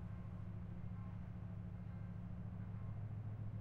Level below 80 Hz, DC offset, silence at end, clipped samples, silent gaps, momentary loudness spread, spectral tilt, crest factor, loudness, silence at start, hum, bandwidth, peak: -58 dBFS; under 0.1%; 0 s; under 0.1%; none; 2 LU; -10 dB/octave; 12 dB; -50 LUFS; 0 s; none; 4 kHz; -36 dBFS